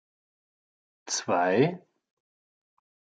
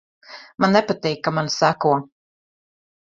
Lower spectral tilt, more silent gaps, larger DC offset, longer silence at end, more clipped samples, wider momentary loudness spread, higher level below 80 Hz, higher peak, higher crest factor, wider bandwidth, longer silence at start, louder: about the same, -4 dB/octave vs -5 dB/octave; neither; neither; first, 1.4 s vs 1 s; neither; about the same, 10 LU vs 9 LU; second, -80 dBFS vs -62 dBFS; second, -10 dBFS vs -2 dBFS; about the same, 22 dB vs 20 dB; first, 8.8 kHz vs 7.6 kHz; first, 1.05 s vs 0.3 s; second, -26 LUFS vs -20 LUFS